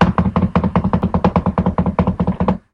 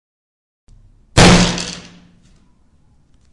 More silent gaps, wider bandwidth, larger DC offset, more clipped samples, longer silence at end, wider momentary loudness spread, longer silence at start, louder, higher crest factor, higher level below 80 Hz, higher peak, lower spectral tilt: neither; second, 6 kHz vs 11.5 kHz; neither; neither; second, 0.15 s vs 1.55 s; second, 2 LU vs 19 LU; second, 0 s vs 1.15 s; second, -17 LUFS vs -12 LUFS; about the same, 16 dB vs 18 dB; about the same, -28 dBFS vs -28 dBFS; about the same, 0 dBFS vs 0 dBFS; first, -9.5 dB/octave vs -4 dB/octave